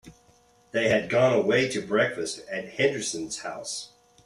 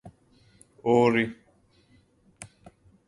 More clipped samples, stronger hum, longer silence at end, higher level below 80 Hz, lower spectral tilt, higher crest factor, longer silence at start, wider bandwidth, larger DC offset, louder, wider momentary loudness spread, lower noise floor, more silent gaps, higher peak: neither; neither; second, 0.4 s vs 0.65 s; about the same, -64 dBFS vs -64 dBFS; second, -4 dB/octave vs -6.5 dB/octave; about the same, 18 dB vs 22 dB; about the same, 0.05 s vs 0.05 s; first, 13 kHz vs 11.5 kHz; neither; about the same, -26 LUFS vs -24 LUFS; second, 12 LU vs 26 LU; about the same, -60 dBFS vs -63 dBFS; neither; about the same, -10 dBFS vs -8 dBFS